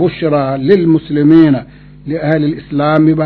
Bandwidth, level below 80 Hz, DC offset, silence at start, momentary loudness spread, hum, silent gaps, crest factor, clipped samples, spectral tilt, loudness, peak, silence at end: 4.5 kHz; -42 dBFS; under 0.1%; 0 s; 10 LU; none; none; 12 dB; 0.6%; -10.5 dB/octave; -11 LUFS; 0 dBFS; 0 s